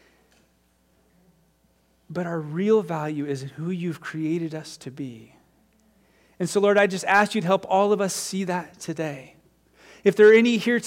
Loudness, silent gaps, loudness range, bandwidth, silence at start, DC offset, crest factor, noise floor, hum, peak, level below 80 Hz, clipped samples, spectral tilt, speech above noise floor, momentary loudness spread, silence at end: -22 LUFS; none; 9 LU; 16 kHz; 2.1 s; under 0.1%; 18 dB; -64 dBFS; none; -6 dBFS; -70 dBFS; under 0.1%; -5 dB/octave; 42 dB; 18 LU; 0 s